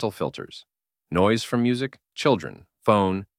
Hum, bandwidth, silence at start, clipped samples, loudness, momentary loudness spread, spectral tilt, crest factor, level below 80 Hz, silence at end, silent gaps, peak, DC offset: none; 15.5 kHz; 0 s; under 0.1%; -24 LUFS; 17 LU; -6 dB/octave; 20 dB; -56 dBFS; 0.15 s; none; -4 dBFS; under 0.1%